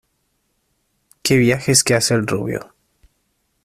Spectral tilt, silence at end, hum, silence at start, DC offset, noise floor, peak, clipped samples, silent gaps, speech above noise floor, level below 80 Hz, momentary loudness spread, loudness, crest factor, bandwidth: -4 dB/octave; 1 s; none; 1.25 s; under 0.1%; -68 dBFS; 0 dBFS; under 0.1%; none; 52 dB; -52 dBFS; 12 LU; -17 LUFS; 20 dB; 15.5 kHz